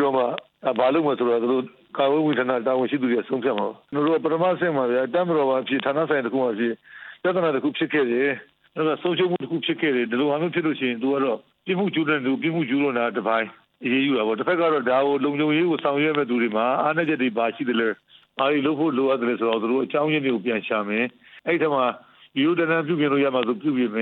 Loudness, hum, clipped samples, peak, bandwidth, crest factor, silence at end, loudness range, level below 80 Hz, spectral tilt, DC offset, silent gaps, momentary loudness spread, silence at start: -23 LUFS; none; under 0.1%; -6 dBFS; 4.4 kHz; 16 dB; 0 s; 2 LU; -76 dBFS; -9 dB/octave; under 0.1%; none; 6 LU; 0 s